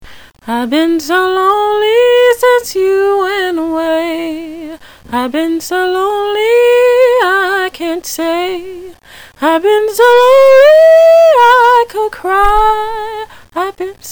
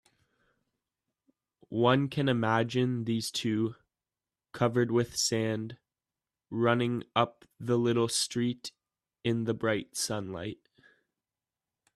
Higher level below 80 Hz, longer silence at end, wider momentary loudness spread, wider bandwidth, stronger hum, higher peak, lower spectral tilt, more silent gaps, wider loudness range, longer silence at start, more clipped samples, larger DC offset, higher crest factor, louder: first, -34 dBFS vs -68 dBFS; second, 0 s vs 1.4 s; about the same, 15 LU vs 13 LU; first, over 20 kHz vs 14 kHz; neither; first, 0 dBFS vs -10 dBFS; second, -3 dB/octave vs -5 dB/octave; neither; first, 8 LU vs 3 LU; second, 0 s vs 1.7 s; neither; neither; second, 10 dB vs 22 dB; first, -10 LUFS vs -30 LUFS